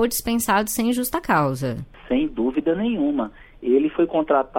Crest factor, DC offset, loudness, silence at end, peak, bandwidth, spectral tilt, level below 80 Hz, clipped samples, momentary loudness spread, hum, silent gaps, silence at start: 14 dB; under 0.1%; -22 LUFS; 0 s; -6 dBFS; 16.5 kHz; -5 dB/octave; -46 dBFS; under 0.1%; 7 LU; none; none; 0 s